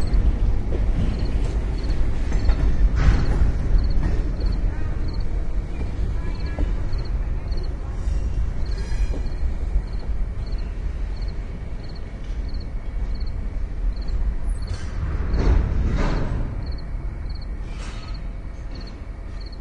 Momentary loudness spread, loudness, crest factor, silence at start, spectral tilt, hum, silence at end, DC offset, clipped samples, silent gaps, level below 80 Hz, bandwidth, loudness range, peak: 11 LU; -27 LUFS; 18 dB; 0 s; -7.5 dB/octave; none; 0 s; under 0.1%; under 0.1%; none; -22 dBFS; 8 kHz; 8 LU; -2 dBFS